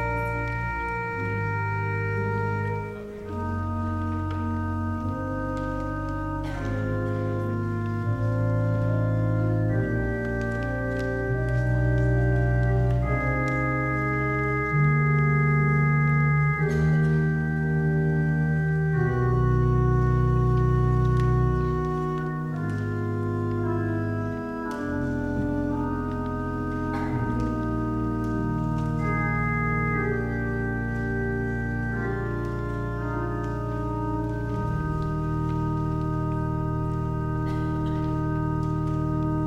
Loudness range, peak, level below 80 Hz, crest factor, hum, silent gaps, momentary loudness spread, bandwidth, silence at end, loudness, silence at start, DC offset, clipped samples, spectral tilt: 6 LU; -10 dBFS; -36 dBFS; 14 dB; none; none; 7 LU; 7.8 kHz; 0 s; -26 LUFS; 0 s; under 0.1%; under 0.1%; -9.5 dB/octave